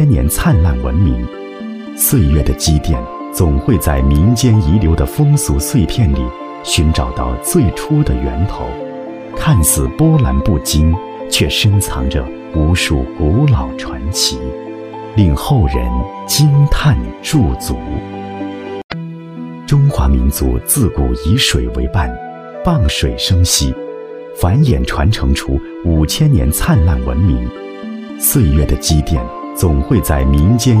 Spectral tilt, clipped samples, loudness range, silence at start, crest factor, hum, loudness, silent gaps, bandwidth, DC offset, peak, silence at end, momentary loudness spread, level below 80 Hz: -5 dB/octave; under 0.1%; 3 LU; 0 s; 14 dB; none; -14 LUFS; 18.84-18.89 s; 16 kHz; under 0.1%; 0 dBFS; 0 s; 13 LU; -20 dBFS